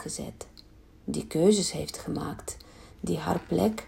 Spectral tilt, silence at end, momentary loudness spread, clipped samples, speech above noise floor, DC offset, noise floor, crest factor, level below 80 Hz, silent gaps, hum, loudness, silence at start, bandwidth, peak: -5 dB/octave; 0 s; 20 LU; under 0.1%; 25 dB; under 0.1%; -53 dBFS; 20 dB; -52 dBFS; none; none; -29 LUFS; 0 s; 16 kHz; -10 dBFS